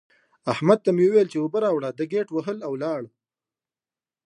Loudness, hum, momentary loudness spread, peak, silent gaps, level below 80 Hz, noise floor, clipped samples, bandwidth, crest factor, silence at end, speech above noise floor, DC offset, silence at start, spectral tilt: -23 LUFS; none; 12 LU; -4 dBFS; none; -72 dBFS; under -90 dBFS; under 0.1%; 10 kHz; 20 dB; 1.2 s; over 68 dB; under 0.1%; 0.45 s; -7.5 dB/octave